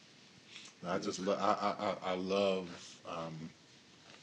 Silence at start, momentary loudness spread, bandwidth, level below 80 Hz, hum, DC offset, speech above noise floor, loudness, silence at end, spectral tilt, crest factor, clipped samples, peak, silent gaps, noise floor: 0 s; 19 LU; 10.5 kHz; -82 dBFS; none; under 0.1%; 24 dB; -37 LUFS; 0 s; -4.5 dB/octave; 22 dB; under 0.1%; -16 dBFS; none; -61 dBFS